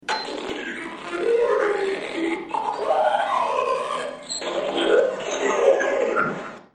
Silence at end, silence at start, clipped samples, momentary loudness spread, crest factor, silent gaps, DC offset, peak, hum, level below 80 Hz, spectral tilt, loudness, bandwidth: 0.15 s; 0.05 s; under 0.1%; 10 LU; 18 dB; none; under 0.1%; -4 dBFS; none; -62 dBFS; -3 dB/octave; -23 LUFS; 10.5 kHz